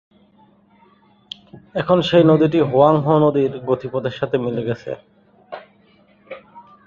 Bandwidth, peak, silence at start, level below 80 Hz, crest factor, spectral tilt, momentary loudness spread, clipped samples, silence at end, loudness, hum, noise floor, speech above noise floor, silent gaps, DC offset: 7.4 kHz; -2 dBFS; 1.55 s; -56 dBFS; 18 dB; -8.5 dB/octave; 24 LU; under 0.1%; 0.25 s; -17 LUFS; none; -54 dBFS; 37 dB; none; under 0.1%